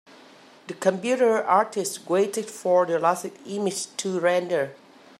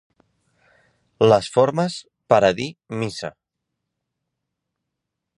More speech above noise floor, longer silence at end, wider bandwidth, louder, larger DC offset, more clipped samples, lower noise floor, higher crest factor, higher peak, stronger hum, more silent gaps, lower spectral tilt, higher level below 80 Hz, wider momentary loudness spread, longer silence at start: second, 27 dB vs 62 dB; second, 0.45 s vs 2.1 s; first, 15.5 kHz vs 11.5 kHz; second, -24 LUFS vs -20 LUFS; neither; neither; second, -50 dBFS vs -81 dBFS; about the same, 18 dB vs 22 dB; second, -6 dBFS vs -2 dBFS; neither; neither; second, -4 dB/octave vs -5.5 dB/octave; second, -80 dBFS vs -58 dBFS; second, 8 LU vs 15 LU; second, 0.7 s vs 1.2 s